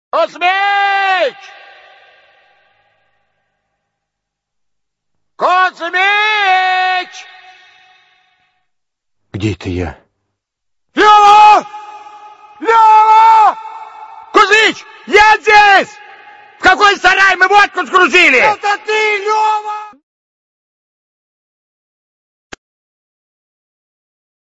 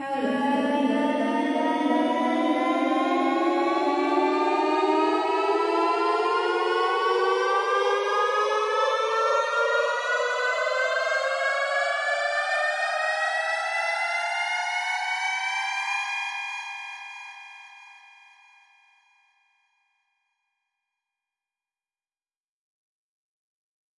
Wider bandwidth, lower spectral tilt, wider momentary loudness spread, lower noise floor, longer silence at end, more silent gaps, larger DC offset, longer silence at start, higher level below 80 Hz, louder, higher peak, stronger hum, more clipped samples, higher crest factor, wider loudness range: about the same, 11 kHz vs 11.5 kHz; about the same, -3 dB/octave vs -2.5 dB/octave; first, 17 LU vs 4 LU; second, -77 dBFS vs under -90 dBFS; second, 4.65 s vs 6.05 s; neither; neither; first, 0.15 s vs 0 s; first, -48 dBFS vs -80 dBFS; first, -9 LUFS vs -24 LUFS; first, 0 dBFS vs -10 dBFS; neither; first, 0.2% vs under 0.1%; about the same, 14 dB vs 16 dB; first, 13 LU vs 7 LU